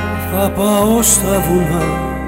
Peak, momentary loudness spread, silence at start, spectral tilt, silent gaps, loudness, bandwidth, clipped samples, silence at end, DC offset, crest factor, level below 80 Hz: -2 dBFS; 7 LU; 0 s; -4.5 dB/octave; none; -14 LUFS; 16.5 kHz; under 0.1%; 0 s; under 0.1%; 12 dB; -28 dBFS